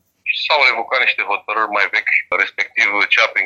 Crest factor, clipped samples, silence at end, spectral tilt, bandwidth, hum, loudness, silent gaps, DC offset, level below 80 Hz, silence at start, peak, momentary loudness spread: 16 dB; under 0.1%; 0 s; -0.5 dB/octave; 7.8 kHz; none; -15 LUFS; none; under 0.1%; -70 dBFS; 0.25 s; 0 dBFS; 6 LU